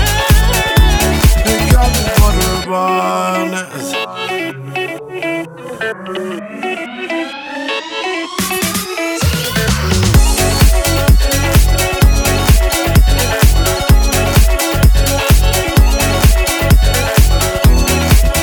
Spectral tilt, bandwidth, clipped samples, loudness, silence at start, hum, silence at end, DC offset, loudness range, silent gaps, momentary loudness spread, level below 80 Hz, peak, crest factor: -4.5 dB/octave; over 20 kHz; under 0.1%; -13 LUFS; 0 s; none; 0 s; under 0.1%; 9 LU; none; 10 LU; -14 dBFS; 0 dBFS; 12 dB